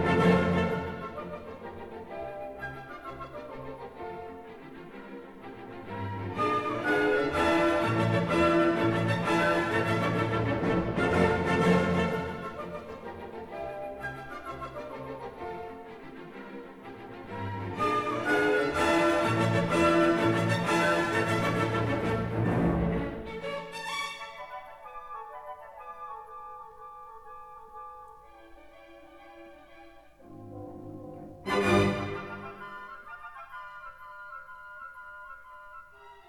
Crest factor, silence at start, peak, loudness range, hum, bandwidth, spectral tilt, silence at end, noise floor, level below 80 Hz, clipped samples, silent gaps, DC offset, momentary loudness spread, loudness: 20 dB; 0 s; -10 dBFS; 19 LU; none; 14 kHz; -6 dB/octave; 0.1 s; -52 dBFS; -52 dBFS; under 0.1%; none; under 0.1%; 21 LU; -28 LUFS